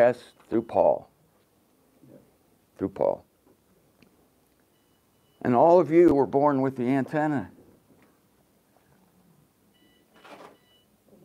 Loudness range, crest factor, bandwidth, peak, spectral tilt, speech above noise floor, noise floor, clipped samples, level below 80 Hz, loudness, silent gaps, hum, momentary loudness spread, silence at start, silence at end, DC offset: 13 LU; 20 dB; 10.5 kHz; -6 dBFS; -8.5 dB/octave; 43 dB; -65 dBFS; under 0.1%; -62 dBFS; -24 LUFS; none; none; 15 LU; 0 s; 0.9 s; under 0.1%